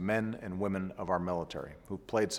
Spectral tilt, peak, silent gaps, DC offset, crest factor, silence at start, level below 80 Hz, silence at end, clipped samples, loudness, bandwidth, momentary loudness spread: -5.5 dB/octave; -16 dBFS; none; under 0.1%; 18 dB; 0 s; -60 dBFS; 0 s; under 0.1%; -36 LUFS; 16.5 kHz; 10 LU